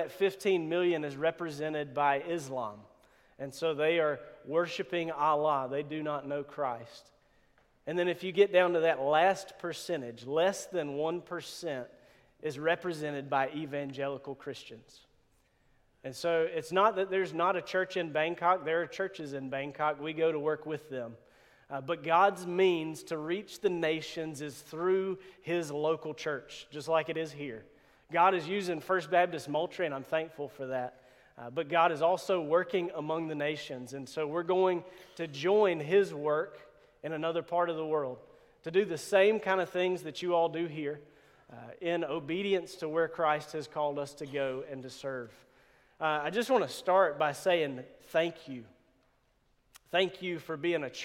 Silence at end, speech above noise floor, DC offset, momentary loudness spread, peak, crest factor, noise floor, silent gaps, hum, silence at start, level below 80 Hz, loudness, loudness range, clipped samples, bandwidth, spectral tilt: 0 s; 40 dB; under 0.1%; 14 LU; -12 dBFS; 20 dB; -71 dBFS; none; none; 0 s; -74 dBFS; -32 LUFS; 5 LU; under 0.1%; 16 kHz; -5 dB/octave